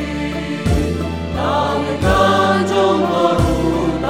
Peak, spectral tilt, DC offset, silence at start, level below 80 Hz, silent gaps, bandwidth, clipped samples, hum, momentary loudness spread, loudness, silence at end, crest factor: -2 dBFS; -6 dB/octave; 0.5%; 0 s; -28 dBFS; none; 16.5 kHz; under 0.1%; none; 9 LU; -16 LUFS; 0 s; 14 dB